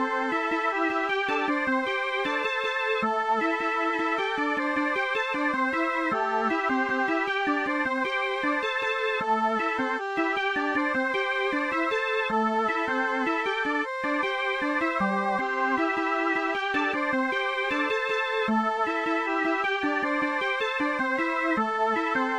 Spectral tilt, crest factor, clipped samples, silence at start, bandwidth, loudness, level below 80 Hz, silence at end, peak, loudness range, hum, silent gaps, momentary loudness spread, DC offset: -4.5 dB/octave; 12 dB; under 0.1%; 0 s; 11 kHz; -26 LUFS; -64 dBFS; 0 s; -14 dBFS; 0 LU; none; none; 1 LU; under 0.1%